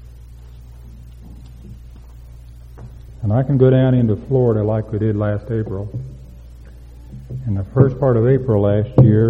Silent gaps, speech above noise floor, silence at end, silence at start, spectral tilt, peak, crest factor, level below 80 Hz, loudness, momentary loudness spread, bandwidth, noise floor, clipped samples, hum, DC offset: none; 23 dB; 0 s; 0.05 s; -11 dB/octave; 0 dBFS; 18 dB; -38 dBFS; -17 LUFS; 26 LU; 3.7 kHz; -38 dBFS; under 0.1%; none; under 0.1%